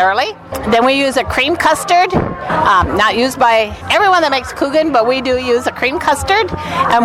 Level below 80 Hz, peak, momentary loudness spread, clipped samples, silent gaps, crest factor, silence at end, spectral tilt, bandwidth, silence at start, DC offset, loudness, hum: -36 dBFS; 0 dBFS; 5 LU; under 0.1%; none; 12 dB; 0 s; -4 dB/octave; 16.5 kHz; 0 s; under 0.1%; -13 LUFS; none